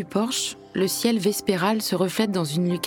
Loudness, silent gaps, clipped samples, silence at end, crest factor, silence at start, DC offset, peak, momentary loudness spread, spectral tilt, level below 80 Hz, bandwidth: -23 LUFS; none; under 0.1%; 0 s; 16 dB; 0 s; under 0.1%; -6 dBFS; 4 LU; -4.5 dB/octave; -64 dBFS; over 20 kHz